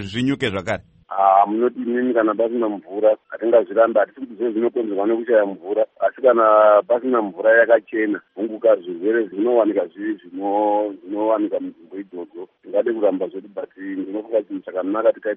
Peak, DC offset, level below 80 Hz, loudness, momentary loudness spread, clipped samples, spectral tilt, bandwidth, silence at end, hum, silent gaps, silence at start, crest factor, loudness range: -2 dBFS; under 0.1%; -64 dBFS; -19 LUFS; 13 LU; under 0.1%; -4 dB/octave; 8 kHz; 0 s; none; none; 0 s; 18 dB; 7 LU